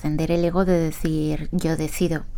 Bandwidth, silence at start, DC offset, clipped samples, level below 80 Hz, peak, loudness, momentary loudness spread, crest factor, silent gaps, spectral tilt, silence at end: 18 kHz; 0 s; under 0.1%; under 0.1%; -32 dBFS; -6 dBFS; -23 LUFS; 5 LU; 16 dB; none; -6.5 dB/octave; 0 s